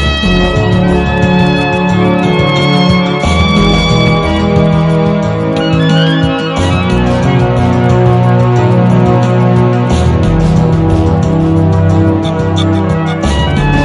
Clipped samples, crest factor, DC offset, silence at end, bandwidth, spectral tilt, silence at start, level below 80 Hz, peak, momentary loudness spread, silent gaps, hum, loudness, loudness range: under 0.1%; 8 dB; under 0.1%; 0 s; 11 kHz; -7 dB/octave; 0 s; -22 dBFS; 0 dBFS; 3 LU; none; none; -10 LUFS; 1 LU